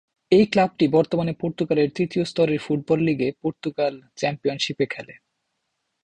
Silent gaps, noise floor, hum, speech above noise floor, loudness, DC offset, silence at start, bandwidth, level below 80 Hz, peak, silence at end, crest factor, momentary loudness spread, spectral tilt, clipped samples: none; -76 dBFS; none; 55 dB; -22 LUFS; under 0.1%; 0.3 s; 9.6 kHz; -60 dBFS; -4 dBFS; 0.9 s; 18 dB; 8 LU; -6.5 dB/octave; under 0.1%